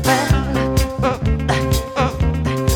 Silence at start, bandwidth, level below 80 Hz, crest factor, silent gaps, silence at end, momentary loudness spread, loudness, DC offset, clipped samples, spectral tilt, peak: 0 s; 20 kHz; -24 dBFS; 16 dB; none; 0 s; 3 LU; -18 LUFS; under 0.1%; under 0.1%; -5.5 dB/octave; -2 dBFS